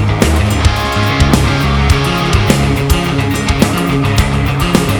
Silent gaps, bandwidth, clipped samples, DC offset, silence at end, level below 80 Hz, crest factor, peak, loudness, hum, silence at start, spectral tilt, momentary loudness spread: none; over 20 kHz; under 0.1%; under 0.1%; 0 s; -18 dBFS; 12 dB; 0 dBFS; -12 LUFS; none; 0 s; -5.5 dB/octave; 3 LU